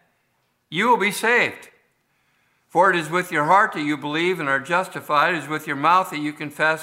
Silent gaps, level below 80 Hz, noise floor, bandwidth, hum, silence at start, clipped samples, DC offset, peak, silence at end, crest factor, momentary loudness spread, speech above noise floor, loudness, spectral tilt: none; -76 dBFS; -69 dBFS; 16 kHz; none; 0.7 s; under 0.1%; under 0.1%; -4 dBFS; 0 s; 18 dB; 8 LU; 48 dB; -20 LUFS; -4 dB/octave